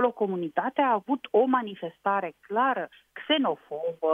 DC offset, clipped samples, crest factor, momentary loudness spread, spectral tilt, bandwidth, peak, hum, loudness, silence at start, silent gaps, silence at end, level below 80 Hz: under 0.1%; under 0.1%; 18 dB; 9 LU; -7 dB/octave; 3.8 kHz; -10 dBFS; none; -27 LUFS; 0 s; none; 0 s; -80 dBFS